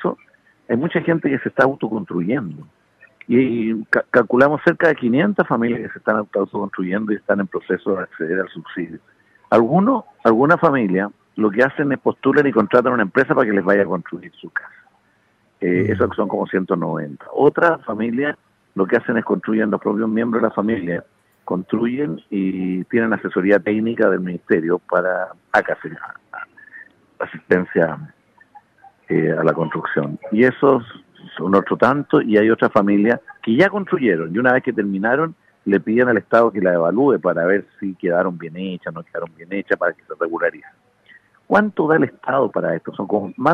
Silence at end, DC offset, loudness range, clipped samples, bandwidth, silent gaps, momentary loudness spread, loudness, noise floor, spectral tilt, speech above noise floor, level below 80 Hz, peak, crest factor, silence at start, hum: 0 s; under 0.1%; 6 LU; under 0.1%; 7.6 kHz; none; 12 LU; -19 LUFS; -60 dBFS; -8.5 dB/octave; 42 dB; -62 dBFS; -2 dBFS; 16 dB; 0 s; none